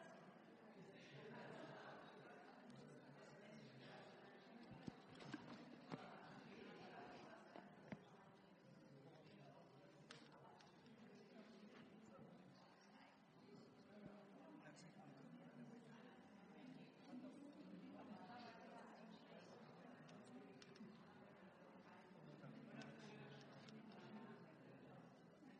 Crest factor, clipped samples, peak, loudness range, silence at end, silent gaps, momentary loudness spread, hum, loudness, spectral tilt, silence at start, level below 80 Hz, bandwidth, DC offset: 24 dB; under 0.1%; -38 dBFS; 5 LU; 0 s; none; 8 LU; none; -63 LUFS; -6 dB/octave; 0 s; under -90 dBFS; 9.6 kHz; under 0.1%